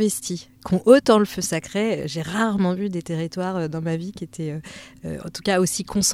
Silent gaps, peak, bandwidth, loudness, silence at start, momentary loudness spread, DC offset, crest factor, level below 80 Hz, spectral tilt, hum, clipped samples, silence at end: none; -2 dBFS; 16 kHz; -22 LUFS; 0 s; 17 LU; under 0.1%; 20 dB; -52 dBFS; -4.5 dB/octave; none; under 0.1%; 0 s